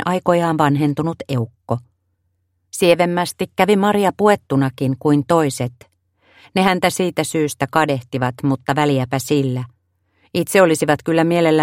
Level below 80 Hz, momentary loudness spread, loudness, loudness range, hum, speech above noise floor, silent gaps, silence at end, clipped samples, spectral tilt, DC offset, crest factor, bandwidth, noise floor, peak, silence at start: -56 dBFS; 10 LU; -18 LUFS; 3 LU; none; 51 dB; none; 0 s; under 0.1%; -5.5 dB/octave; under 0.1%; 18 dB; 16.5 kHz; -68 dBFS; 0 dBFS; 0 s